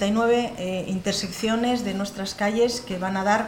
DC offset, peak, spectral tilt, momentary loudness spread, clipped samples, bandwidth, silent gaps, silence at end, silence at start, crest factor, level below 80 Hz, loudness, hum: under 0.1%; -8 dBFS; -4.5 dB/octave; 7 LU; under 0.1%; 17.5 kHz; none; 0 s; 0 s; 16 dB; -52 dBFS; -25 LUFS; none